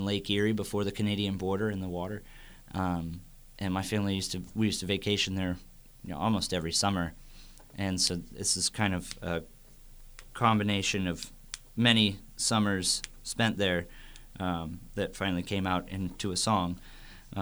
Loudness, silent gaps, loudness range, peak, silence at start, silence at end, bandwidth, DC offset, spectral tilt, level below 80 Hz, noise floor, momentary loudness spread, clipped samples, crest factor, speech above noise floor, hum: -30 LUFS; none; 5 LU; -8 dBFS; 0 s; 0 s; over 20 kHz; under 0.1%; -4 dB/octave; -50 dBFS; -51 dBFS; 14 LU; under 0.1%; 24 dB; 21 dB; none